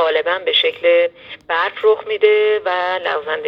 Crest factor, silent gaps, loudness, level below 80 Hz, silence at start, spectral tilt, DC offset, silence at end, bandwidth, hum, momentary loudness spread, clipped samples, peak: 16 dB; none; -16 LUFS; -64 dBFS; 0 s; -3.5 dB/octave; under 0.1%; 0 s; 5.4 kHz; none; 6 LU; under 0.1%; 0 dBFS